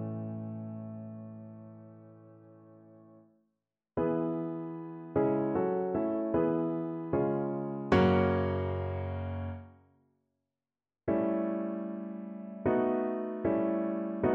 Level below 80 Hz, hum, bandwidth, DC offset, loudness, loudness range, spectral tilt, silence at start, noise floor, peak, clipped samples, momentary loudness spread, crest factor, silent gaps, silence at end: -60 dBFS; none; 6.2 kHz; under 0.1%; -32 LUFS; 12 LU; -7.5 dB/octave; 0 s; under -90 dBFS; -14 dBFS; under 0.1%; 14 LU; 20 dB; none; 0 s